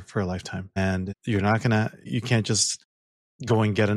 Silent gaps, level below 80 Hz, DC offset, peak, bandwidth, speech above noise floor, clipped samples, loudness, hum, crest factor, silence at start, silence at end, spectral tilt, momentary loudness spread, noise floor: 2.85-3.39 s; -56 dBFS; under 0.1%; -8 dBFS; 12 kHz; over 66 dB; under 0.1%; -25 LUFS; none; 18 dB; 0 s; 0 s; -4.5 dB/octave; 10 LU; under -90 dBFS